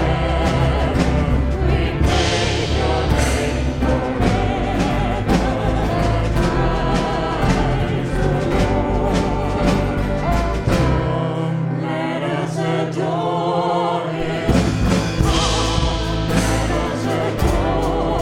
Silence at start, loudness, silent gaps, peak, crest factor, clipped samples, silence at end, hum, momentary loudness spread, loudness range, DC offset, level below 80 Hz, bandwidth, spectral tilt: 0 s; -19 LUFS; none; -2 dBFS; 16 dB; under 0.1%; 0 s; none; 3 LU; 2 LU; under 0.1%; -24 dBFS; 16 kHz; -6 dB/octave